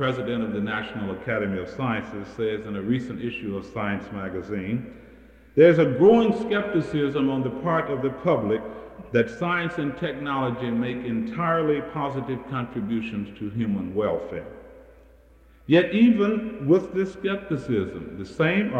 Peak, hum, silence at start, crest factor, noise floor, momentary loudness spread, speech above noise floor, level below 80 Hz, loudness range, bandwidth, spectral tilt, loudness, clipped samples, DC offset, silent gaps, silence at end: -6 dBFS; none; 0 s; 20 dB; -53 dBFS; 13 LU; 29 dB; -54 dBFS; 8 LU; 8.6 kHz; -8 dB/octave; -24 LUFS; under 0.1%; under 0.1%; none; 0 s